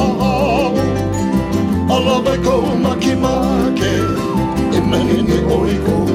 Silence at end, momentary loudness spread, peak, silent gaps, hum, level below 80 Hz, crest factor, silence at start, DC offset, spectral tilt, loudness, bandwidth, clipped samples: 0 s; 3 LU; -4 dBFS; none; none; -30 dBFS; 12 dB; 0 s; under 0.1%; -6.5 dB/octave; -15 LUFS; 16 kHz; under 0.1%